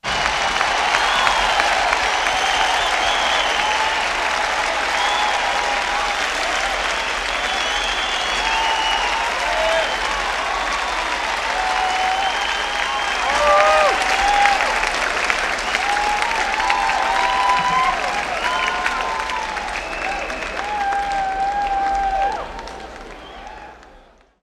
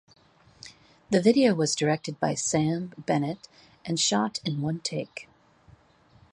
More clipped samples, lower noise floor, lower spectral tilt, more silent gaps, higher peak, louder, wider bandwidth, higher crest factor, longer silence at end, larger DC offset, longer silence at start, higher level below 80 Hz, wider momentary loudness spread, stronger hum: neither; second, -49 dBFS vs -59 dBFS; second, -1 dB/octave vs -4.5 dB/octave; neither; first, 0 dBFS vs -8 dBFS; first, -18 LUFS vs -26 LUFS; first, 14.5 kHz vs 11.5 kHz; about the same, 20 dB vs 20 dB; second, 0.45 s vs 1.1 s; neither; second, 0.05 s vs 0.65 s; first, -40 dBFS vs -64 dBFS; second, 8 LU vs 21 LU; neither